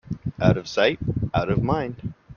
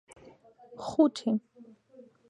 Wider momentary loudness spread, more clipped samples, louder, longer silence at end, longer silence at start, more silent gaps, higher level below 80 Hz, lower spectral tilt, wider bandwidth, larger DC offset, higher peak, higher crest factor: second, 11 LU vs 17 LU; neither; first, -23 LUFS vs -29 LUFS; second, 0 s vs 0.65 s; second, 0.1 s vs 0.7 s; neither; first, -42 dBFS vs -70 dBFS; about the same, -7 dB/octave vs -6.5 dB/octave; second, 7 kHz vs 11 kHz; neither; first, -2 dBFS vs -10 dBFS; about the same, 20 dB vs 22 dB